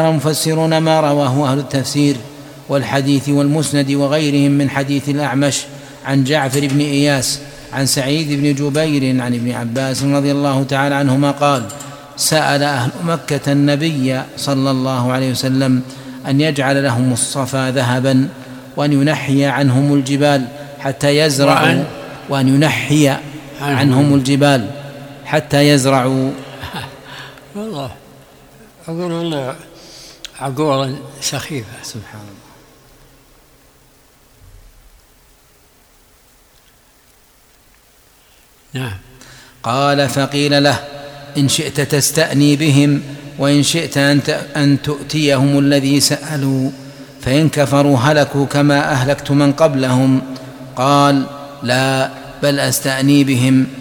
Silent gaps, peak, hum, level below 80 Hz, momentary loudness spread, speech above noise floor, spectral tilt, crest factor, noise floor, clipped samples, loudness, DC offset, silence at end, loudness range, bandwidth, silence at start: none; 0 dBFS; none; -50 dBFS; 15 LU; 35 dB; -5 dB/octave; 16 dB; -49 dBFS; under 0.1%; -15 LUFS; under 0.1%; 0 s; 9 LU; 18.5 kHz; 0 s